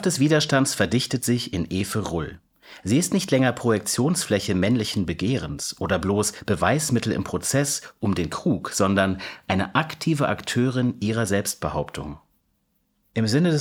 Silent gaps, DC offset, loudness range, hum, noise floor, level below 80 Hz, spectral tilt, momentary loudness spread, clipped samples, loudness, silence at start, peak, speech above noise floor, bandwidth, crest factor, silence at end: none; under 0.1%; 2 LU; none; -70 dBFS; -48 dBFS; -4.5 dB/octave; 7 LU; under 0.1%; -23 LUFS; 0 s; -2 dBFS; 47 dB; 17.5 kHz; 22 dB; 0 s